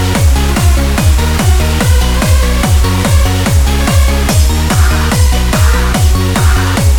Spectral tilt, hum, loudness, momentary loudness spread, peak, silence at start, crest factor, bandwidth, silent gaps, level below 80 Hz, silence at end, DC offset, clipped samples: -5 dB/octave; none; -10 LUFS; 0 LU; 0 dBFS; 0 s; 8 dB; 19 kHz; none; -10 dBFS; 0 s; under 0.1%; under 0.1%